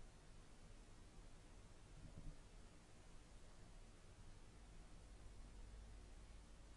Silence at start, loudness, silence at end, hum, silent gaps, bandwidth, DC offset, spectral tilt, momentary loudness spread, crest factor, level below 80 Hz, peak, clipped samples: 0 s; -65 LUFS; 0 s; none; none; 11 kHz; under 0.1%; -4.5 dB/octave; 4 LU; 18 dB; -62 dBFS; -42 dBFS; under 0.1%